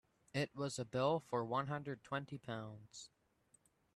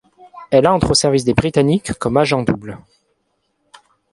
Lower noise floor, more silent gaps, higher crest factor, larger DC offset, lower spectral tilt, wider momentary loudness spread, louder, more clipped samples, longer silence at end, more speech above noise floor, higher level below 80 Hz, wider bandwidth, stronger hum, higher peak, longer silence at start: first, -75 dBFS vs -68 dBFS; neither; about the same, 20 dB vs 18 dB; neither; about the same, -5.5 dB/octave vs -5 dB/octave; first, 17 LU vs 10 LU; second, -42 LUFS vs -16 LUFS; neither; second, 0.9 s vs 1.35 s; second, 34 dB vs 52 dB; second, -76 dBFS vs -40 dBFS; about the same, 12.5 kHz vs 11.5 kHz; neither; second, -22 dBFS vs 0 dBFS; about the same, 0.35 s vs 0.35 s